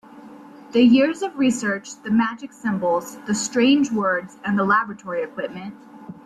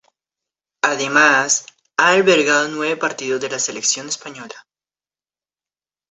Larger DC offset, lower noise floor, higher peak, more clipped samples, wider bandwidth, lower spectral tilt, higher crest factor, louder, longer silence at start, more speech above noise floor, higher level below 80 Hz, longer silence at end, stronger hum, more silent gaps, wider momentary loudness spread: neither; second, -42 dBFS vs under -90 dBFS; second, -6 dBFS vs 0 dBFS; neither; first, 13 kHz vs 8.4 kHz; first, -4.5 dB/octave vs -1.5 dB/octave; about the same, 16 dB vs 18 dB; second, -21 LUFS vs -17 LUFS; second, 0.1 s vs 0.85 s; second, 22 dB vs over 73 dB; first, -62 dBFS vs -68 dBFS; second, 0.05 s vs 1.5 s; neither; neither; about the same, 13 LU vs 14 LU